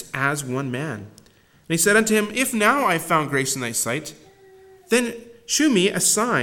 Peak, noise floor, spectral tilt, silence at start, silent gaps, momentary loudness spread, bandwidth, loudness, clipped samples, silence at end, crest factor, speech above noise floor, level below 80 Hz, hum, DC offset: -2 dBFS; -55 dBFS; -3 dB/octave; 0 s; none; 12 LU; 17.5 kHz; -20 LUFS; under 0.1%; 0 s; 20 dB; 34 dB; -60 dBFS; none; under 0.1%